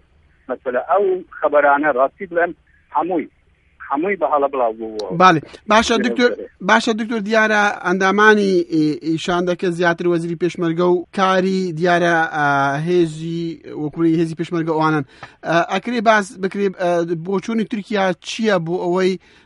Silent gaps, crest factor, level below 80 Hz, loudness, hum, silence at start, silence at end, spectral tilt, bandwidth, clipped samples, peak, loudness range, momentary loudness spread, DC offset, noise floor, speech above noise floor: none; 18 dB; -56 dBFS; -18 LUFS; none; 0.5 s; 0.3 s; -5.5 dB/octave; 11.5 kHz; under 0.1%; 0 dBFS; 4 LU; 9 LU; under 0.1%; -43 dBFS; 25 dB